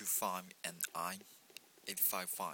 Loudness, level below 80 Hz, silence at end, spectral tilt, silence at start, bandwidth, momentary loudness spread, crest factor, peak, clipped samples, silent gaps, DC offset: -38 LUFS; -86 dBFS; 0 s; -1 dB/octave; 0 s; 19 kHz; 21 LU; 24 dB; -18 dBFS; under 0.1%; none; under 0.1%